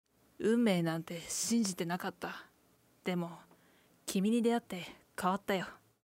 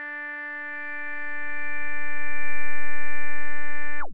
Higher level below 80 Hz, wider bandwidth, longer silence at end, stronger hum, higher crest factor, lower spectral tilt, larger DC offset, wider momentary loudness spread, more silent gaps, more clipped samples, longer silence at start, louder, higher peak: second, -74 dBFS vs -56 dBFS; first, 16 kHz vs 6 kHz; first, 0.3 s vs 0 s; neither; first, 18 dB vs 6 dB; second, -4.5 dB/octave vs -7.5 dB/octave; second, under 0.1% vs 10%; first, 14 LU vs 2 LU; neither; neither; first, 0.4 s vs 0 s; second, -35 LUFS vs -31 LUFS; second, -18 dBFS vs -10 dBFS